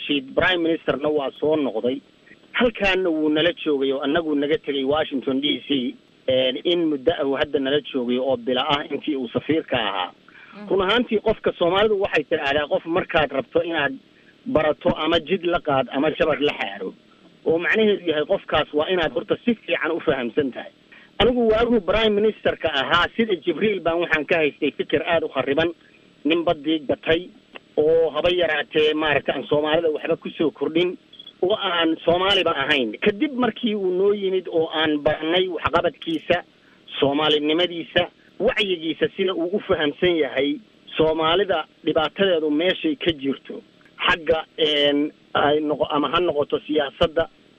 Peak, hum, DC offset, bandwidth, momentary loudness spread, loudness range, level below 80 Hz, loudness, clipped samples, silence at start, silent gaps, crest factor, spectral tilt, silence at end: -4 dBFS; none; under 0.1%; 8.2 kHz; 6 LU; 2 LU; -48 dBFS; -21 LUFS; under 0.1%; 0 s; none; 18 dB; -6 dB/octave; 0.3 s